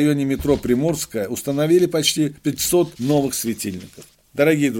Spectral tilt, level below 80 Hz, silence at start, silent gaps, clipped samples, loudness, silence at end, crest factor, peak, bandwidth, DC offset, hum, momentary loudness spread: -4.5 dB/octave; -46 dBFS; 0 s; none; under 0.1%; -20 LUFS; 0 s; 18 dB; -2 dBFS; 17 kHz; under 0.1%; none; 8 LU